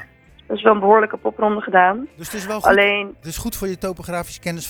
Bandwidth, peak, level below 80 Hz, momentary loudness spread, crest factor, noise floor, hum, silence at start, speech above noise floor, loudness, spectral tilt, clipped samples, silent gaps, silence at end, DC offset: over 20 kHz; 0 dBFS; -44 dBFS; 14 LU; 18 dB; -44 dBFS; none; 0 s; 26 dB; -18 LUFS; -4 dB/octave; under 0.1%; none; 0 s; under 0.1%